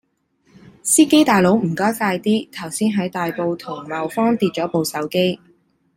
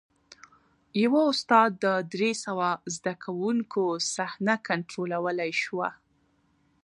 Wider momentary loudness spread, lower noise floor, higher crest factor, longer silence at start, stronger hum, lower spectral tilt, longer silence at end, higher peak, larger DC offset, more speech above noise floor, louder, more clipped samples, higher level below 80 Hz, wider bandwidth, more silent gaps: about the same, 13 LU vs 11 LU; second, -62 dBFS vs -68 dBFS; about the same, 18 dB vs 22 dB; about the same, 0.85 s vs 0.95 s; neither; about the same, -4.5 dB/octave vs -4 dB/octave; second, 0.6 s vs 0.9 s; first, -2 dBFS vs -6 dBFS; neither; about the same, 44 dB vs 41 dB; first, -18 LUFS vs -27 LUFS; neither; first, -60 dBFS vs -76 dBFS; first, 16.5 kHz vs 11.5 kHz; neither